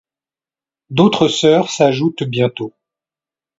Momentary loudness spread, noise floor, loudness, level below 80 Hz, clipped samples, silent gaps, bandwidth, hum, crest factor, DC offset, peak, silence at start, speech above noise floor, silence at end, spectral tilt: 10 LU; under -90 dBFS; -15 LUFS; -58 dBFS; under 0.1%; none; 8 kHz; none; 16 dB; under 0.1%; 0 dBFS; 0.9 s; over 76 dB; 0.9 s; -5.5 dB/octave